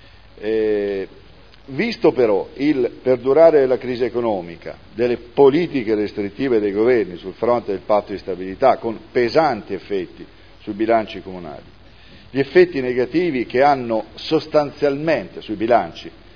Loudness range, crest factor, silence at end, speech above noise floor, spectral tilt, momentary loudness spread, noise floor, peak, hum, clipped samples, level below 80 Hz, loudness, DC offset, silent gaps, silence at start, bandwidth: 4 LU; 18 dB; 0.25 s; 28 dB; -7.5 dB/octave; 15 LU; -46 dBFS; 0 dBFS; none; under 0.1%; -50 dBFS; -19 LUFS; 0.4%; none; 0.4 s; 5.4 kHz